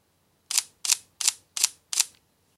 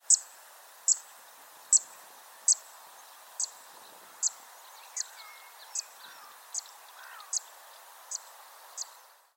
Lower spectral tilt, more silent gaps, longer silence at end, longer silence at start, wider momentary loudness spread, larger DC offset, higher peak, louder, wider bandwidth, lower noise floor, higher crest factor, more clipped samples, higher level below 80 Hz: about the same, 4.5 dB/octave vs 5 dB/octave; neither; about the same, 0.5 s vs 0.5 s; first, 0.5 s vs 0.1 s; second, 3 LU vs 26 LU; neither; first, 0 dBFS vs -8 dBFS; first, -25 LUFS vs -30 LUFS; second, 16.5 kHz vs 19 kHz; first, -68 dBFS vs -56 dBFS; about the same, 30 dB vs 26 dB; neither; first, -80 dBFS vs under -90 dBFS